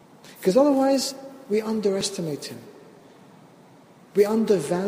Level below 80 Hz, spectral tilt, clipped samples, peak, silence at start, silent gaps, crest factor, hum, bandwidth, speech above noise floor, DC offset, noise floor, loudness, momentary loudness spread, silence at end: -68 dBFS; -5 dB/octave; under 0.1%; -6 dBFS; 0.25 s; none; 18 dB; none; 15.5 kHz; 29 dB; under 0.1%; -51 dBFS; -23 LUFS; 15 LU; 0 s